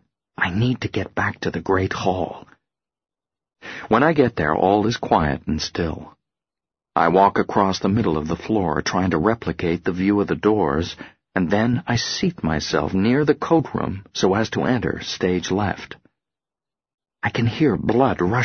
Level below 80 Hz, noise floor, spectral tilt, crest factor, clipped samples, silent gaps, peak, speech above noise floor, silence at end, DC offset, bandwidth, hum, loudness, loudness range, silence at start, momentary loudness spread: -44 dBFS; under -90 dBFS; -6 dB/octave; 20 dB; under 0.1%; 16.94-16.98 s; -2 dBFS; over 70 dB; 0 s; under 0.1%; 6.6 kHz; none; -21 LUFS; 4 LU; 0.4 s; 9 LU